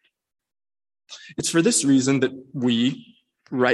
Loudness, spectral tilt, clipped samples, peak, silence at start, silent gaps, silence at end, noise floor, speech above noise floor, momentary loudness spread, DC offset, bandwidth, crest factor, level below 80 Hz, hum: -21 LUFS; -4 dB/octave; under 0.1%; -6 dBFS; 1.1 s; none; 0 s; under -90 dBFS; over 69 dB; 17 LU; under 0.1%; 12.5 kHz; 18 dB; -64 dBFS; none